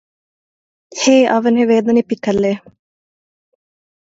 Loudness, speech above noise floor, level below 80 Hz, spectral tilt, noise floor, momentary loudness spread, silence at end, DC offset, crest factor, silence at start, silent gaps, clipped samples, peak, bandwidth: -14 LUFS; over 77 dB; -58 dBFS; -4.5 dB/octave; under -90 dBFS; 9 LU; 1.55 s; under 0.1%; 16 dB; 0.95 s; none; under 0.1%; 0 dBFS; 7.8 kHz